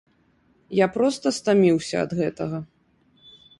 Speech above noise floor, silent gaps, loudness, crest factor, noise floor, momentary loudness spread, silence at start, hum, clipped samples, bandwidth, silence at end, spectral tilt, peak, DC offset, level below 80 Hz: 41 dB; none; -22 LUFS; 18 dB; -62 dBFS; 12 LU; 0.7 s; none; under 0.1%; 11.5 kHz; 0.95 s; -6 dB/octave; -6 dBFS; under 0.1%; -62 dBFS